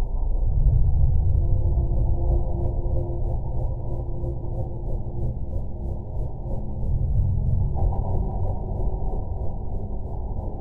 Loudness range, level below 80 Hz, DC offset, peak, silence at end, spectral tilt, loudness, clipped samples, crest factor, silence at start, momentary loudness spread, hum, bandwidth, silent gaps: 6 LU; -24 dBFS; under 0.1%; -8 dBFS; 0 s; -13 dB/octave; -27 LUFS; under 0.1%; 14 dB; 0 s; 10 LU; none; 1.1 kHz; none